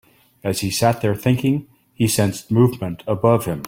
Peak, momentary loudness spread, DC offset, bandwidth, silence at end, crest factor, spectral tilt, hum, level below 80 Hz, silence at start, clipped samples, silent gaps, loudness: -2 dBFS; 8 LU; under 0.1%; 16.5 kHz; 0 s; 18 dB; -6 dB/octave; none; -50 dBFS; 0.45 s; under 0.1%; none; -20 LUFS